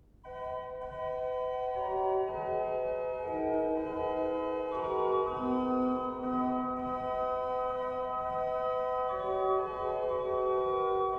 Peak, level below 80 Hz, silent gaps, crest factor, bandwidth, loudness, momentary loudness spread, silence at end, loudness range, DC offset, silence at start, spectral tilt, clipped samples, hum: -18 dBFS; -58 dBFS; none; 14 dB; 5.4 kHz; -33 LUFS; 5 LU; 0 s; 1 LU; under 0.1%; 0.25 s; -8 dB/octave; under 0.1%; none